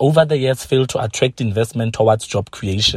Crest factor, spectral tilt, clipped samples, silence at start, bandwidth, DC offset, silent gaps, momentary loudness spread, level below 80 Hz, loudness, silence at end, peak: 16 dB; -5 dB/octave; under 0.1%; 0 s; 14.5 kHz; under 0.1%; none; 7 LU; -44 dBFS; -18 LUFS; 0 s; -2 dBFS